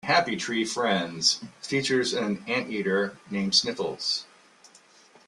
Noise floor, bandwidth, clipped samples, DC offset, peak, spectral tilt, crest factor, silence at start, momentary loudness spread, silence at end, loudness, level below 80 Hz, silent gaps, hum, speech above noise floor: -56 dBFS; 12.5 kHz; under 0.1%; under 0.1%; -8 dBFS; -3 dB/octave; 20 dB; 0.05 s; 8 LU; 1.05 s; -26 LUFS; -68 dBFS; none; none; 30 dB